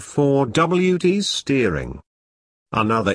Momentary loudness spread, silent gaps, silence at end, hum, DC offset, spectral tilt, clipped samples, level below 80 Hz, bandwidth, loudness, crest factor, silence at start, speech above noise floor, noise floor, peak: 8 LU; 2.06-2.66 s; 0 s; none; under 0.1%; -5.5 dB/octave; under 0.1%; -44 dBFS; 10.5 kHz; -19 LUFS; 16 dB; 0 s; over 71 dB; under -90 dBFS; -4 dBFS